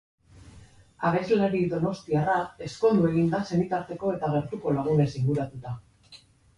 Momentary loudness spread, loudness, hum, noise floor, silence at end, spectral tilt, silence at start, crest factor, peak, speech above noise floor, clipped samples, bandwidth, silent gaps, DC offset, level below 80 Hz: 7 LU; -26 LUFS; none; -54 dBFS; 0.4 s; -8 dB/octave; 0.35 s; 16 dB; -12 dBFS; 29 dB; under 0.1%; 11 kHz; none; under 0.1%; -56 dBFS